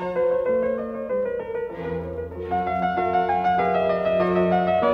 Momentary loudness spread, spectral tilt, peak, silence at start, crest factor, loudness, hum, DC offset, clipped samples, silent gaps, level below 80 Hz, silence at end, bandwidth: 9 LU; -8.5 dB/octave; -8 dBFS; 0 s; 14 dB; -23 LUFS; none; under 0.1%; under 0.1%; none; -50 dBFS; 0 s; 6.2 kHz